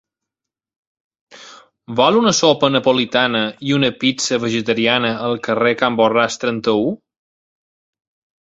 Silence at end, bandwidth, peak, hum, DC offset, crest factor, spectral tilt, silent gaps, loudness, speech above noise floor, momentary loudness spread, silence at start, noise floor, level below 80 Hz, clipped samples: 1.5 s; 8 kHz; 0 dBFS; none; under 0.1%; 18 dB; -4 dB/octave; none; -16 LUFS; 70 dB; 6 LU; 1.35 s; -86 dBFS; -58 dBFS; under 0.1%